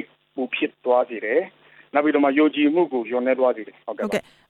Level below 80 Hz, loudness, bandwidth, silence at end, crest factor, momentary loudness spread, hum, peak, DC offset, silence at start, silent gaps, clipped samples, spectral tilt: -70 dBFS; -22 LUFS; 11.5 kHz; 0.3 s; 16 dB; 13 LU; none; -6 dBFS; under 0.1%; 0 s; none; under 0.1%; -5.5 dB/octave